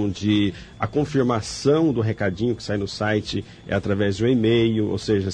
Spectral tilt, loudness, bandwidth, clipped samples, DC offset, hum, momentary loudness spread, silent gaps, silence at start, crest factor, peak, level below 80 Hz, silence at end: -6.5 dB/octave; -22 LUFS; 10 kHz; under 0.1%; under 0.1%; none; 7 LU; none; 0 s; 14 dB; -8 dBFS; -48 dBFS; 0 s